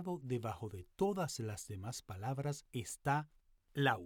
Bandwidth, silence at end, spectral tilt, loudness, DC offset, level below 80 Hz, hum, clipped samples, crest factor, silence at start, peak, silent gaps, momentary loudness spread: 18.5 kHz; 0 s; -5 dB/octave; -41 LUFS; under 0.1%; -68 dBFS; none; under 0.1%; 22 dB; 0 s; -18 dBFS; none; 10 LU